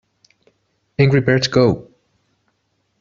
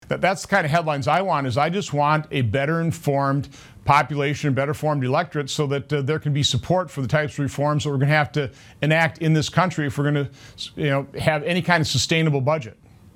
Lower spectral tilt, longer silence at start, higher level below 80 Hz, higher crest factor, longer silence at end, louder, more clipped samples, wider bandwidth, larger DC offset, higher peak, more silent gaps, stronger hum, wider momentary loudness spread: about the same, -5.5 dB/octave vs -5.5 dB/octave; first, 1 s vs 0.1 s; about the same, -50 dBFS vs -52 dBFS; about the same, 18 dB vs 20 dB; first, 1.2 s vs 0.45 s; first, -16 LUFS vs -22 LUFS; neither; second, 7.4 kHz vs 15 kHz; neither; about the same, -2 dBFS vs 0 dBFS; neither; neither; first, 12 LU vs 7 LU